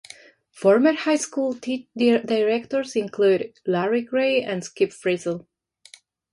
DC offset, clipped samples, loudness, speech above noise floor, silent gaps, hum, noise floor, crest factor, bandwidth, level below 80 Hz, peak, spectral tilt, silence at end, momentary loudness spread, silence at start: under 0.1%; under 0.1%; -22 LUFS; 30 dB; none; none; -52 dBFS; 18 dB; 11.5 kHz; -70 dBFS; -6 dBFS; -4.5 dB/octave; 0.9 s; 8 LU; 0.55 s